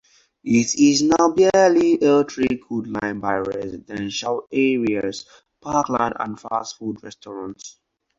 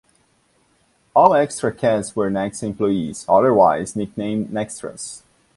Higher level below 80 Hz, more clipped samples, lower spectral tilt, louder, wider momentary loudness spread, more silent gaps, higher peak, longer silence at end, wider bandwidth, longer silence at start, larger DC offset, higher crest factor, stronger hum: about the same, -54 dBFS vs -54 dBFS; neither; about the same, -4.5 dB/octave vs -5.5 dB/octave; about the same, -20 LUFS vs -19 LUFS; first, 19 LU vs 15 LU; neither; second, -4 dBFS vs 0 dBFS; about the same, 0.5 s vs 0.4 s; second, 8 kHz vs 11.5 kHz; second, 0.45 s vs 1.15 s; neither; about the same, 16 dB vs 20 dB; neither